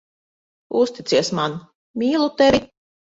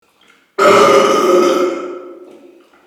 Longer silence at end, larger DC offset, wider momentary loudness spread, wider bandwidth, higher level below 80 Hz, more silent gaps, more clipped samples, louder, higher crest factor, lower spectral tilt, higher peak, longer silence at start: second, 0.45 s vs 0.7 s; neither; second, 10 LU vs 19 LU; second, 8 kHz vs 16.5 kHz; first, -52 dBFS vs -60 dBFS; first, 1.75-1.94 s vs none; second, under 0.1% vs 0.1%; second, -20 LUFS vs -11 LUFS; about the same, 18 dB vs 14 dB; about the same, -4.5 dB/octave vs -3.5 dB/octave; second, -4 dBFS vs 0 dBFS; about the same, 0.7 s vs 0.6 s